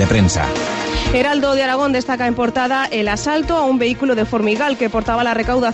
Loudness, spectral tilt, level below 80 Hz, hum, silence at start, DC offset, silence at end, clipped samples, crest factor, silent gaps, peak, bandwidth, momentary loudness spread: -17 LUFS; -5 dB/octave; -32 dBFS; none; 0 s; under 0.1%; 0 s; under 0.1%; 14 dB; none; -2 dBFS; 10 kHz; 3 LU